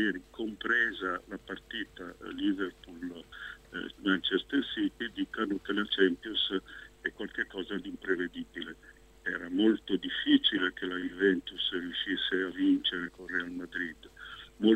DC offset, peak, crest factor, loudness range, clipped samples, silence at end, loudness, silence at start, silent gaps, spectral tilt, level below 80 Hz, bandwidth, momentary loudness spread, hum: under 0.1%; -12 dBFS; 22 dB; 6 LU; under 0.1%; 0 s; -32 LUFS; 0 s; none; -5.5 dB/octave; -62 dBFS; 8.8 kHz; 15 LU; none